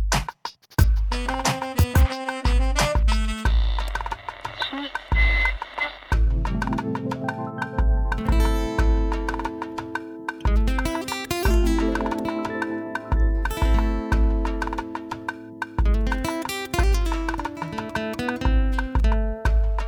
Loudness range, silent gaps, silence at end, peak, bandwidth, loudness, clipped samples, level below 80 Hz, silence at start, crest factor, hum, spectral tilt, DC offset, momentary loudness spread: 3 LU; none; 0 s; -6 dBFS; 18.5 kHz; -25 LUFS; under 0.1%; -24 dBFS; 0 s; 18 dB; none; -5.5 dB/octave; under 0.1%; 9 LU